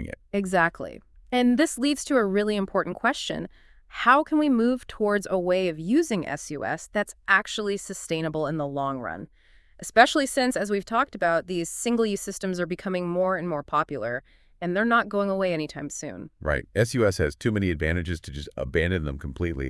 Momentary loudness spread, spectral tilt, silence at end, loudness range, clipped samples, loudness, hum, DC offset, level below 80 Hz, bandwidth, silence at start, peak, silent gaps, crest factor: 12 LU; -5 dB/octave; 0 s; 3 LU; under 0.1%; -25 LUFS; none; under 0.1%; -46 dBFS; 12 kHz; 0 s; 0 dBFS; none; 24 dB